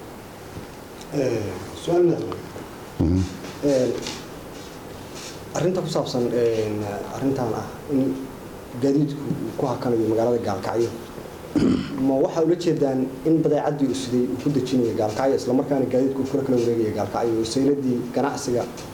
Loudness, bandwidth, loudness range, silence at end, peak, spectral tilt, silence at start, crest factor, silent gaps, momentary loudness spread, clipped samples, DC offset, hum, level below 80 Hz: -23 LUFS; 19.5 kHz; 4 LU; 0 s; -6 dBFS; -6.5 dB/octave; 0 s; 16 dB; none; 16 LU; under 0.1%; under 0.1%; none; -48 dBFS